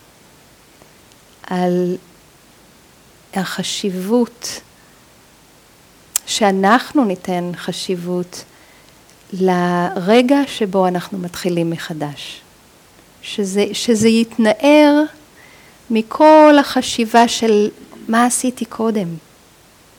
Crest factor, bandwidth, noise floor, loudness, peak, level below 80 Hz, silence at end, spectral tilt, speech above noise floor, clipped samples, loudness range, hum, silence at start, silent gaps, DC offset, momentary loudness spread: 18 dB; over 20 kHz; -48 dBFS; -16 LUFS; 0 dBFS; -58 dBFS; 0.8 s; -4.5 dB/octave; 33 dB; under 0.1%; 11 LU; none; 1.45 s; none; under 0.1%; 17 LU